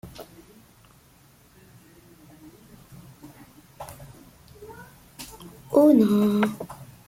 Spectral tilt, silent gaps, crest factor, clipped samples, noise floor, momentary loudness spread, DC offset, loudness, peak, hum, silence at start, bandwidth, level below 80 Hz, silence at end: -7 dB/octave; none; 20 dB; under 0.1%; -56 dBFS; 30 LU; under 0.1%; -20 LUFS; -8 dBFS; none; 0.05 s; 16.5 kHz; -60 dBFS; 0.25 s